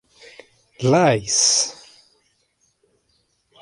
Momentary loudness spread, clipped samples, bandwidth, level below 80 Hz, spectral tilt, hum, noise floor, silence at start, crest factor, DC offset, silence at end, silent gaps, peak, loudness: 9 LU; under 0.1%; 11.5 kHz; -60 dBFS; -3 dB/octave; none; -66 dBFS; 0.8 s; 20 dB; under 0.1%; 1.9 s; none; -4 dBFS; -17 LUFS